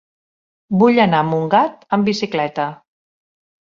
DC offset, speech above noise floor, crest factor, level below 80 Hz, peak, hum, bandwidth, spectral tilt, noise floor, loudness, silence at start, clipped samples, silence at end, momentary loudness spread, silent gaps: under 0.1%; over 74 dB; 18 dB; -60 dBFS; -2 dBFS; none; 7.4 kHz; -6.5 dB/octave; under -90 dBFS; -17 LUFS; 0.7 s; under 0.1%; 1.05 s; 9 LU; none